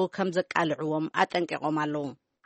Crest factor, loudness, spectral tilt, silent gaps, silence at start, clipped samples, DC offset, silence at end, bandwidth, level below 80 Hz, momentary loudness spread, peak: 22 dB; -28 LUFS; -6 dB/octave; none; 0 s; under 0.1%; under 0.1%; 0.3 s; 8.4 kHz; -74 dBFS; 5 LU; -8 dBFS